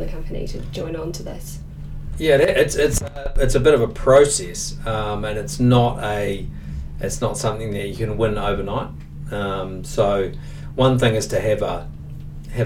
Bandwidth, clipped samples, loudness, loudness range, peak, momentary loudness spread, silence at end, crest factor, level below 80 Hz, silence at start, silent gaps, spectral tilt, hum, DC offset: 17 kHz; under 0.1%; -20 LUFS; 7 LU; -2 dBFS; 17 LU; 0 s; 18 dB; -30 dBFS; 0 s; none; -5 dB/octave; none; under 0.1%